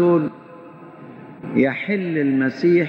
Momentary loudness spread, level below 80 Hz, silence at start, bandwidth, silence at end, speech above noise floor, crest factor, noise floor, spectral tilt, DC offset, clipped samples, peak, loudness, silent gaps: 23 LU; -64 dBFS; 0 s; 6.2 kHz; 0 s; 22 dB; 16 dB; -40 dBFS; -9 dB/octave; under 0.1%; under 0.1%; -6 dBFS; -20 LUFS; none